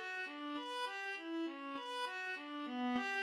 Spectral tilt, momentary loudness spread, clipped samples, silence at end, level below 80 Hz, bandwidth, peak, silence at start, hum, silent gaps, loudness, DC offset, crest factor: -2.5 dB/octave; 5 LU; under 0.1%; 0 s; -88 dBFS; 14.5 kHz; -28 dBFS; 0 s; none; none; -42 LUFS; under 0.1%; 14 dB